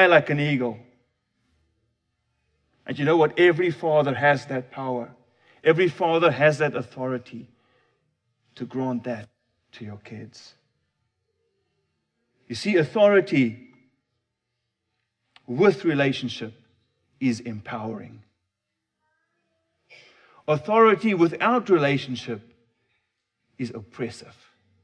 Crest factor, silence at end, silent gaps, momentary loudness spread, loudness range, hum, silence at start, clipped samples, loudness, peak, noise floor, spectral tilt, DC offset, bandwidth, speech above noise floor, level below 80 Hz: 22 dB; 0.65 s; none; 21 LU; 13 LU; none; 0 s; under 0.1%; -22 LUFS; -2 dBFS; -82 dBFS; -6.5 dB/octave; under 0.1%; 10 kHz; 59 dB; -72 dBFS